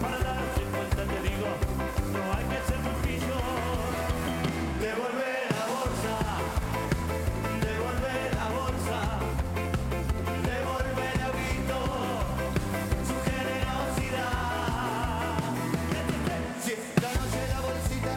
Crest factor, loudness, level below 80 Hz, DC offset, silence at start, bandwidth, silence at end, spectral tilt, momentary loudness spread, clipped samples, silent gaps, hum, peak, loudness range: 20 dB; -30 LUFS; -36 dBFS; under 0.1%; 0 s; 17 kHz; 0 s; -5.5 dB/octave; 1 LU; under 0.1%; none; none; -10 dBFS; 0 LU